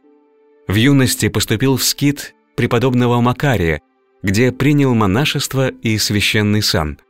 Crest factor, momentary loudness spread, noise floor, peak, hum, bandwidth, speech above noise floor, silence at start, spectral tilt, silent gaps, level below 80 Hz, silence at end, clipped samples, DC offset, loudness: 12 dB; 7 LU; -52 dBFS; -2 dBFS; none; 16.5 kHz; 37 dB; 0.7 s; -5 dB/octave; none; -38 dBFS; 0.15 s; under 0.1%; 0.6%; -15 LUFS